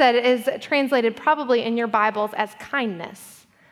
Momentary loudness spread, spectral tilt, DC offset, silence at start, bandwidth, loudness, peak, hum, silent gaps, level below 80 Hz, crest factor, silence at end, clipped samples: 9 LU; -4.5 dB/octave; under 0.1%; 0 s; 15 kHz; -22 LUFS; -6 dBFS; none; none; -72 dBFS; 16 dB; 0.4 s; under 0.1%